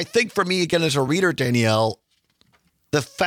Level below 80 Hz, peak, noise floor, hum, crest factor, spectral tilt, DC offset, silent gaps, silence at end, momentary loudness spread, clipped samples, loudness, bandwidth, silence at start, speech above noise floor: -60 dBFS; -8 dBFS; -64 dBFS; none; 14 dB; -4.5 dB/octave; under 0.1%; none; 0 s; 6 LU; under 0.1%; -21 LUFS; 18 kHz; 0 s; 43 dB